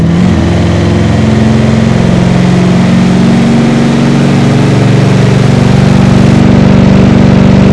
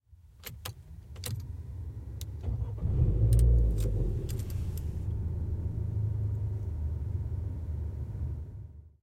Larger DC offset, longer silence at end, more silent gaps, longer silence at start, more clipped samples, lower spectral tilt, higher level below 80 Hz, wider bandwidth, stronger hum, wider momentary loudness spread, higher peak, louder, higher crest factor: neither; second, 0 s vs 0.15 s; neither; about the same, 0 s vs 0.1 s; first, 10% vs under 0.1%; about the same, -7.5 dB/octave vs -7 dB/octave; first, -22 dBFS vs -34 dBFS; second, 11 kHz vs 16.5 kHz; neither; second, 3 LU vs 16 LU; first, 0 dBFS vs -14 dBFS; first, -6 LUFS vs -33 LUFS; second, 4 dB vs 18 dB